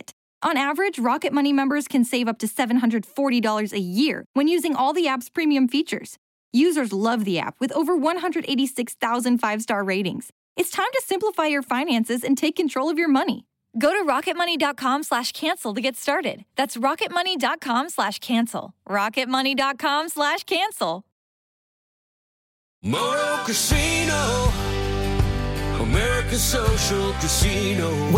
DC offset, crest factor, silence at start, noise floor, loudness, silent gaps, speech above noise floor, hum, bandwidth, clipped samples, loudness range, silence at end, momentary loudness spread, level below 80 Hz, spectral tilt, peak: under 0.1%; 16 dB; 0.1 s; under -90 dBFS; -22 LUFS; 0.13-0.41 s, 4.26-4.34 s, 6.18-6.52 s, 10.32-10.56 s, 21.12-22.82 s; over 68 dB; none; 17 kHz; under 0.1%; 2 LU; 0 s; 5 LU; -36 dBFS; -4 dB/octave; -8 dBFS